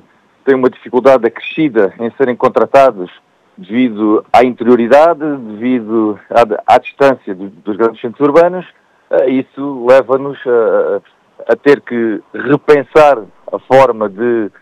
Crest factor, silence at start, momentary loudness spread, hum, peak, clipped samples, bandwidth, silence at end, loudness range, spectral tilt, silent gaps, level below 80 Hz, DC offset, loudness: 12 dB; 0.45 s; 12 LU; none; 0 dBFS; 0.6%; 10.5 kHz; 0.15 s; 2 LU; -7 dB/octave; none; -50 dBFS; under 0.1%; -11 LUFS